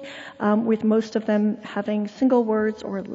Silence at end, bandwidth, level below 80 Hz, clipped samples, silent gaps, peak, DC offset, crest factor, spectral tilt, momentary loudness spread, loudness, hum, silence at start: 0 s; 7.8 kHz; -66 dBFS; under 0.1%; none; -8 dBFS; under 0.1%; 14 dB; -7.5 dB/octave; 7 LU; -23 LUFS; none; 0 s